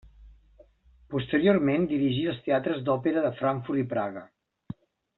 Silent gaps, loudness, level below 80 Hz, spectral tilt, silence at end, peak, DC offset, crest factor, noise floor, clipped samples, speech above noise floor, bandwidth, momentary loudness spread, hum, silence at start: none; -27 LUFS; -58 dBFS; -5.5 dB/octave; 0.95 s; -8 dBFS; under 0.1%; 20 dB; -58 dBFS; under 0.1%; 32 dB; 4.2 kHz; 21 LU; none; 0.05 s